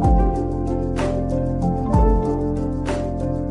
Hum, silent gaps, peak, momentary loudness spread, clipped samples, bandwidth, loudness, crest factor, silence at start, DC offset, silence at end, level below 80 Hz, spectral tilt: none; none; -4 dBFS; 6 LU; under 0.1%; 10.5 kHz; -21 LUFS; 14 dB; 0 s; under 0.1%; 0 s; -24 dBFS; -8.5 dB/octave